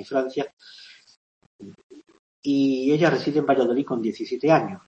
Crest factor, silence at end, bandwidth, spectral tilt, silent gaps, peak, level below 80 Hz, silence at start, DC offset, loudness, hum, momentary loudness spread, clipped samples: 20 dB; 0.1 s; 8 kHz; -7 dB/octave; 0.53-0.57 s, 1.17-1.59 s, 1.83-1.90 s, 2.19-2.43 s; -4 dBFS; -70 dBFS; 0 s; under 0.1%; -23 LUFS; none; 13 LU; under 0.1%